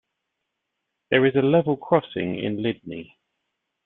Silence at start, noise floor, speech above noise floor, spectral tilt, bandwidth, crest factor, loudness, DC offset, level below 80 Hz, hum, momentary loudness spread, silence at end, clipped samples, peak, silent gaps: 1.1 s; -80 dBFS; 58 dB; -10.5 dB/octave; 4.1 kHz; 22 dB; -22 LUFS; under 0.1%; -62 dBFS; none; 15 LU; 0.8 s; under 0.1%; -4 dBFS; none